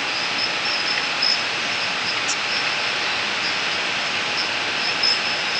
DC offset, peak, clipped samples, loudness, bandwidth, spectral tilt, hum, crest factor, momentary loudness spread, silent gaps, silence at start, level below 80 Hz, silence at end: under 0.1%; -8 dBFS; under 0.1%; -20 LUFS; 10.5 kHz; -0.5 dB/octave; none; 16 dB; 3 LU; none; 0 s; -62 dBFS; 0 s